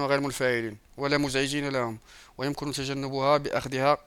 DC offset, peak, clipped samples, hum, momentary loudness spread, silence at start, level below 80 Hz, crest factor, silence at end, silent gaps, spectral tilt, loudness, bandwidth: under 0.1%; -8 dBFS; under 0.1%; none; 9 LU; 0 s; -54 dBFS; 20 dB; 0.05 s; none; -4.5 dB/octave; -28 LUFS; 17 kHz